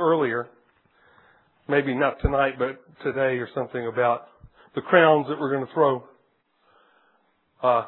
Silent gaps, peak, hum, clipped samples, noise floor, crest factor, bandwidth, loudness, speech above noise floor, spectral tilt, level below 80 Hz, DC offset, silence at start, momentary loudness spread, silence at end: none; -4 dBFS; none; under 0.1%; -67 dBFS; 22 dB; 4.2 kHz; -24 LUFS; 44 dB; -10 dB/octave; -44 dBFS; under 0.1%; 0 s; 12 LU; 0 s